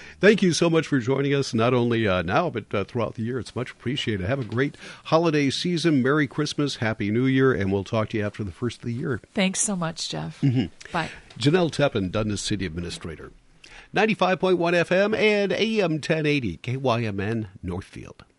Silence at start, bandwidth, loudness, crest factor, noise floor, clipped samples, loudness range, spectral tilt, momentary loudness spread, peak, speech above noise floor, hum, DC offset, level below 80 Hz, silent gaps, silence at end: 0 s; 11.5 kHz; -24 LUFS; 18 dB; -48 dBFS; under 0.1%; 4 LU; -5 dB/octave; 10 LU; -6 dBFS; 25 dB; none; under 0.1%; -48 dBFS; none; 0.15 s